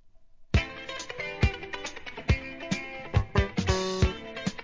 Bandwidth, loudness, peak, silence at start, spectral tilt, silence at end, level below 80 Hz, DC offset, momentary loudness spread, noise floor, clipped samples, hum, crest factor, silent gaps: 7.6 kHz; -30 LUFS; -10 dBFS; 0.35 s; -5.5 dB/octave; 0 s; -34 dBFS; 0.2%; 9 LU; -52 dBFS; under 0.1%; none; 20 dB; none